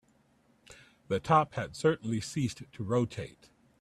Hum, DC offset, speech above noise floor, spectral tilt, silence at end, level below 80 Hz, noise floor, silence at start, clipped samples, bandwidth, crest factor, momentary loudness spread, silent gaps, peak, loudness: none; under 0.1%; 37 dB; -6 dB/octave; 0.5 s; -62 dBFS; -67 dBFS; 0.7 s; under 0.1%; 13.5 kHz; 22 dB; 13 LU; none; -10 dBFS; -31 LUFS